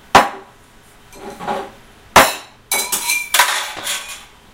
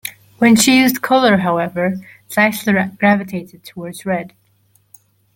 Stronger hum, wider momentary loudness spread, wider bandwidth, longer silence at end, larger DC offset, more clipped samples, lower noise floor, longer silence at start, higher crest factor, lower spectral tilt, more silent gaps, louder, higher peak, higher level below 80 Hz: neither; first, 23 LU vs 19 LU; about the same, 17.5 kHz vs 17 kHz; second, 0.3 s vs 1.05 s; neither; first, 0.2% vs under 0.1%; second, -46 dBFS vs -57 dBFS; about the same, 0.15 s vs 0.05 s; about the same, 18 dB vs 16 dB; second, -1 dB/octave vs -4 dB/octave; neither; about the same, -16 LUFS vs -15 LUFS; about the same, 0 dBFS vs 0 dBFS; first, -44 dBFS vs -56 dBFS